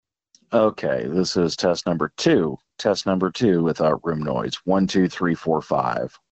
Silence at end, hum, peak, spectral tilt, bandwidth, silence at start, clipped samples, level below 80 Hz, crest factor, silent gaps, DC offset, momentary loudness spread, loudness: 0.25 s; none; -4 dBFS; -6 dB/octave; 8.4 kHz; 0.5 s; under 0.1%; -52 dBFS; 18 dB; none; under 0.1%; 6 LU; -22 LUFS